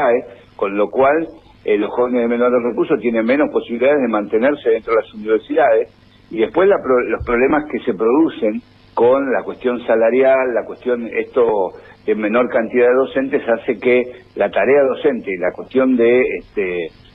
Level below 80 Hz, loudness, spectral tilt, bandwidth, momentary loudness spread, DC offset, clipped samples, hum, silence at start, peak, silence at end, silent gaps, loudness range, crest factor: -48 dBFS; -16 LUFS; -8.5 dB/octave; 4.9 kHz; 8 LU; under 0.1%; under 0.1%; none; 0 s; -4 dBFS; 0.25 s; none; 1 LU; 12 dB